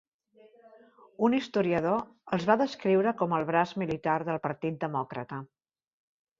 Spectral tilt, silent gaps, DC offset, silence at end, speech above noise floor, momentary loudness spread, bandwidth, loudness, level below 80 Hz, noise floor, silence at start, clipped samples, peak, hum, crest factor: -7 dB/octave; none; under 0.1%; 0.95 s; 32 dB; 8 LU; 7.6 kHz; -29 LUFS; -68 dBFS; -60 dBFS; 1.2 s; under 0.1%; -8 dBFS; none; 22 dB